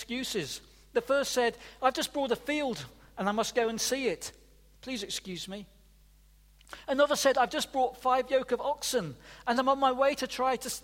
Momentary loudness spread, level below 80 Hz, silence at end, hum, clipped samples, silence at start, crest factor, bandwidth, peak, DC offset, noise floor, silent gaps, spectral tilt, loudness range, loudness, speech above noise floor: 14 LU; -60 dBFS; 0.05 s; none; under 0.1%; 0 s; 20 dB; 16.5 kHz; -10 dBFS; under 0.1%; -60 dBFS; none; -3 dB/octave; 6 LU; -30 LUFS; 30 dB